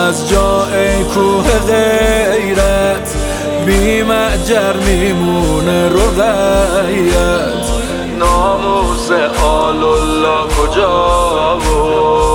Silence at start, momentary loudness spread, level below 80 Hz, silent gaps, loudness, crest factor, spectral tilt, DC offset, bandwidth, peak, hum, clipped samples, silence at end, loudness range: 0 s; 4 LU; -20 dBFS; none; -12 LUFS; 10 dB; -4.5 dB/octave; under 0.1%; 19 kHz; 0 dBFS; none; under 0.1%; 0 s; 1 LU